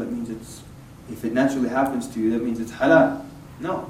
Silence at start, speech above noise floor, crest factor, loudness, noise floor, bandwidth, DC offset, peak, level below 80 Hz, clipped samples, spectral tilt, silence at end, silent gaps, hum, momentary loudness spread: 0 s; 21 dB; 20 dB; -22 LUFS; -43 dBFS; 16 kHz; under 0.1%; -4 dBFS; -52 dBFS; under 0.1%; -6 dB/octave; 0 s; none; none; 21 LU